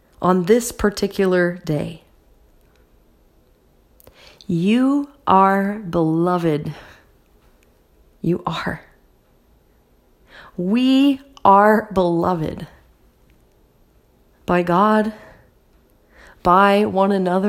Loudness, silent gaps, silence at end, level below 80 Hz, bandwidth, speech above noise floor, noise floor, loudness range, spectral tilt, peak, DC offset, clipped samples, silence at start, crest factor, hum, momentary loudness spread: -18 LUFS; none; 0 s; -48 dBFS; 16 kHz; 39 dB; -56 dBFS; 11 LU; -6.5 dB/octave; 0 dBFS; under 0.1%; under 0.1%; 0.2 s; 20 dB; none; 14 LU